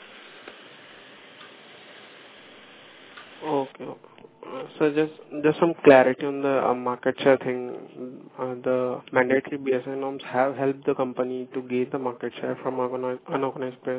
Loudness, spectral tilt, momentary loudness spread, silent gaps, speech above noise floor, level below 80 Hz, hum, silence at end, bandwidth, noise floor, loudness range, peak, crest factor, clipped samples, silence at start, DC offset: -25 LUFS; -10 dB/octave; 24 LU; none; 24 dB; -76 dBFS; none; 0 s; 4 kHz; -48 dBFS; 14 LU; 0 dBFS; 26 dB; under 0.1%; 0 s; under 0.1%